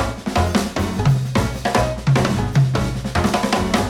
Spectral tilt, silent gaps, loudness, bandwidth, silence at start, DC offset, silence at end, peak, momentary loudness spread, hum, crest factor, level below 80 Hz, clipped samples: -6 dB/octave; none; -19 LUFS; 16 kHz; 0 s; under 0.1%; 0 s; -2 dBFS; 4 LU; none; 16 dB; -32 dBFS; under 0.1%